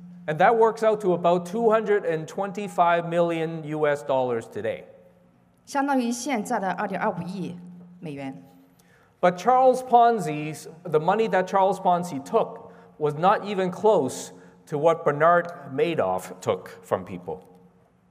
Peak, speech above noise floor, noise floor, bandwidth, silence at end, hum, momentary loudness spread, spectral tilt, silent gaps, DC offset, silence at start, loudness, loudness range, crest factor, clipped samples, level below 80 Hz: -4 dBFS; 35 dB; -59 dBFS; 15.5 kHz; 0.7 s; none; 16 LU; -5.5 dB/octave; none; under 0.1%; 0 s; -24 LUFS; 6 LU; 20 dB; under 0.1%; -72 dBFS